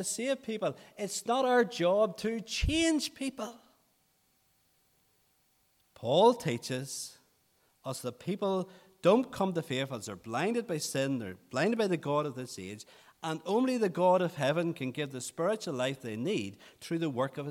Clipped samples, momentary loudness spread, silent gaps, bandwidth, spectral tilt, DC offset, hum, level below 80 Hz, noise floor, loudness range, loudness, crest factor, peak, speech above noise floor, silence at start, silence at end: under 0.1%; 14 LU; none; 16.5 kHz; -4.5 dB/octave; under 0.1%; none; -52 dBFS; -72 dBFS; 3 LU; -32 LUFS; 20 dB; -12 dBFS; 41 dB; 0 s; 0 s